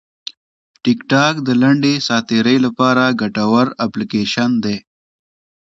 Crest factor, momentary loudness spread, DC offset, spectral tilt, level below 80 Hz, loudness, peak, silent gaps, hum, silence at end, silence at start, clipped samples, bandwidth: 16 dB; 9 LU; under 0.1%; -5.5 dB/octave; -56 dBFS; -15 LUFS; 0 dBFS; none; none; 0.8 s; 0.85 s; under 0.1%; 7.8 kHz